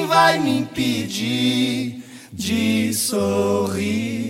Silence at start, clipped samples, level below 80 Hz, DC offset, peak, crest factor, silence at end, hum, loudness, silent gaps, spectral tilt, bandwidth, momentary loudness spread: 0 s; under 0.1%; -56 dBFS; under 0.1%; -2 dBFS; 18 dB; 0 s; none; -20 LUFS; none; -4 dB/octave; 17 kHz; 10 LU